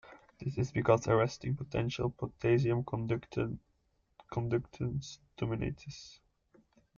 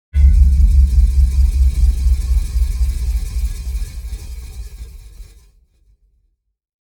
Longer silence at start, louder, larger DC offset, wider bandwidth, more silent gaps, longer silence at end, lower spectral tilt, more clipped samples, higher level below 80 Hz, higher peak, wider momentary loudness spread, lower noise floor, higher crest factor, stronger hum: about the same, 0.05 s vs 0.15 s; second, -34 LUFS vs -17 LUFS; neither; second, 7.4 kHz vs 12 kHz; neither; second, 0.85 s vs 1.6 s; about the same, -7 dB/octave vs -6.5 dB/octave; neither; second, -56 dBFS vs -16 dBFS; second, -14 dBFS vs 0 dBFS; second, 15 LU vs 20 LU; first, -75 dBFS vs -63 dBFS; first, 22 dB vs 14 dB; neither